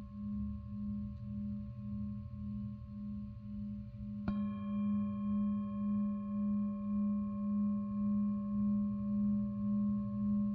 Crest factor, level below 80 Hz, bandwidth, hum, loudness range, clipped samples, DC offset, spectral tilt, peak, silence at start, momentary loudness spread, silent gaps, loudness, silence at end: 12 dB; -54 dBFS; 3.4 kHz; none; 8 LU; under 0.1%; under 0.1%; -11 dB/octave; -24 dBFS; 0 s; 10 LU; none; -38 LUFS; 0 s